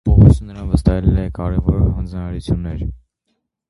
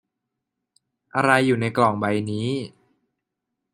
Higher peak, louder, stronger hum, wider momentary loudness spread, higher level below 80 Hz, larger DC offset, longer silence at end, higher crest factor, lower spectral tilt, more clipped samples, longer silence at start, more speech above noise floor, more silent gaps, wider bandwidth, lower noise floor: about the same, 0 dBFS vs -2 dBFS; first, -17 LUFS vs -22 LUFS; neither; first, 14 LU vs 11 LU; first, -22 dBFS vs -64 dBFS; neither; second, 0.75 s vs 1.05 s; second, 16 dB vs 22 dB; first, -9.5 dB/octave vs -6 dB/octave; neither; second, 0.05 s vs 1.15 s; second, 53 dB vs 61 dB; neither; about the same, 11.5 kHz vs 12.5 kHz; second, -71 dBFS vs -82 dBFS